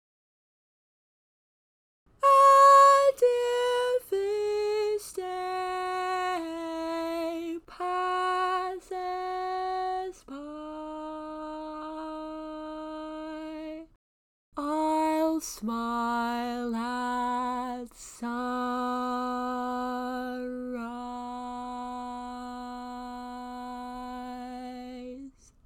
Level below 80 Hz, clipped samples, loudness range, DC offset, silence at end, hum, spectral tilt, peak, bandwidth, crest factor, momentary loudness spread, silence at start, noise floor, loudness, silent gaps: -62 dBFS; under 0.1%; 17 LU; under 0.1%; 0.35 s; none; -3 dB/octave; -10 dBFS; 17.5 kHz; 20 dB; 14 LU; 2.2 s; under -90 dBFS; -28 LUFS; 13.96-14.52 s